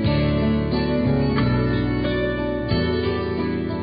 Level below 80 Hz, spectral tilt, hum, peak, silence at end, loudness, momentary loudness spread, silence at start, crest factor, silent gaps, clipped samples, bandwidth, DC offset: -32 dBFS; -12 dB/octave; none; -8 dBFS; 0 s; -22 LUFS; 4 LU; 0 s; 14 dB; none; under 0.1%; 5.2 kHz; under 0.1%